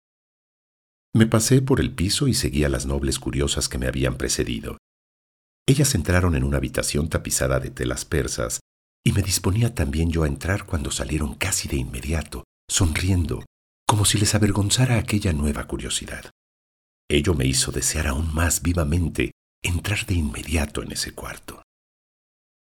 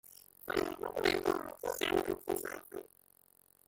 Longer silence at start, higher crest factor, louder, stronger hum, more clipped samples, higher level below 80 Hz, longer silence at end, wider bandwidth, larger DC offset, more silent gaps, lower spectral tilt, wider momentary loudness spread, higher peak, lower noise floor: first, 1.15 s vs 0.05 s; about the same, 24 dB vs 22 dB; first, -23 LUFS vs -36 LUFS; neither; neither; first, -34 dBFS vs -62 dBFS; first, 1.15 s vs 0.85 s; first, 19 kHz vs 17 kHz; neither; first, 4.79-5.66 s, 8.61-9.04 s, 12.44-12.68 s, 13.47-13.86 s, 16.31-17.08 s, 19.32-19.62 s vs none; about the same, -4.5 dB/octave vs -3.5 dB/octave; second, 9 LU vs 17 LU; first, 0 dBFS vs -16 dBFS; first, under -90 dBFS vs -67 dBFS